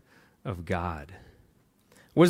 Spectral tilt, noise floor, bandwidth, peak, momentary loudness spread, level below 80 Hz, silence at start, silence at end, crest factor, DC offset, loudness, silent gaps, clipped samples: -7 dB/octave; -64 dBFS; 14 kHz; -8 dBFS; 16 LU; -56 dBFS; 0.45 s; 0 s; 22 dB; under 0.1%; -34 LUFS; none; under 0.1%